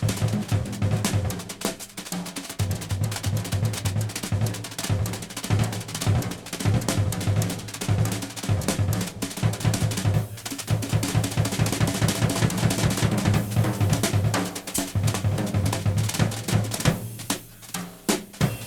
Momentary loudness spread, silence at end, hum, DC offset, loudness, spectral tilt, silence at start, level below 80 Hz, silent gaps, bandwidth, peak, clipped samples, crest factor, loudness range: 7 LU; 0 s; none; under 0.1%; -26 LUFS; -5 dB/octave; 0 s; -42 dBFS; none; 19 kHz; -6 dBFS; under 0.1%; 18 dB; 4 LU